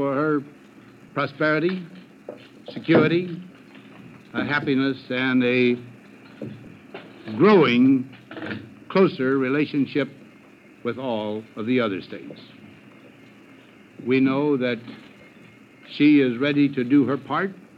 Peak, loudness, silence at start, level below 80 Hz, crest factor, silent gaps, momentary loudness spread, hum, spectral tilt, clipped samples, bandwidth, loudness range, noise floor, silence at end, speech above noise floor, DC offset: -4 dBFS; -22 LUFS; 0 s; -72 dBFS; 20 dB; none; 21 LU; none; -8 dB/octave; under 0.1%; 6 kHz; 7 LU; -49 dBFS; 0.25 s; 28 dB; under 0.1%